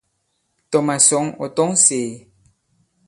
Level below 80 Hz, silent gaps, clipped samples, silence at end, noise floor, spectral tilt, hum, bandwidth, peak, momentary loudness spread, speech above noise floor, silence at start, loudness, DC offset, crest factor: -64 dBFS; none; under 0.1%; 0.9 s; -70 dBFS; -3 dB/octave; none; 11.5 kHz; 0 dBFS; 11 LU; 52 dB; 0.7 s; -16 LUFS; under 0.1%; 20 dB